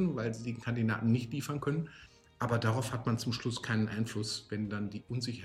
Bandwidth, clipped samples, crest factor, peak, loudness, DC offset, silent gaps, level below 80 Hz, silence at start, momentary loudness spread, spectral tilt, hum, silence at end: 15 kHz; under 0.1%; 16 dB; -18 dBFS; -34 LUFS; under 0.1%; none; -62 dBFS; 0 s; 7 LU; -6 dB/octave; none; 0 s